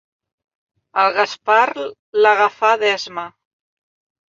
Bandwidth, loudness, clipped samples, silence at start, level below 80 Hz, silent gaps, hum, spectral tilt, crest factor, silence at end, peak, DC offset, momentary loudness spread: 7.6 kHz; -16 LUFS; under 0.1%; 0.95 s; -70 dBFS; 1.99-2.13 s; none; -2 dB/octave; 18 dB; 1.05 s; -2 dBFS; under 0.1%; 14 LU